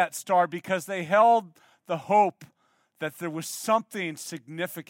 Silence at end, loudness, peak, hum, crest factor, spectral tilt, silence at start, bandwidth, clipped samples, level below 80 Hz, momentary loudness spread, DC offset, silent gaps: 0.05 s; -26 LUFS; -8 dBFS; none; 18 dB; -4 dB/octave; 0 s; 17 kHz; under 0.1%; -82 dBFS; 14 LU; under 0.1%; none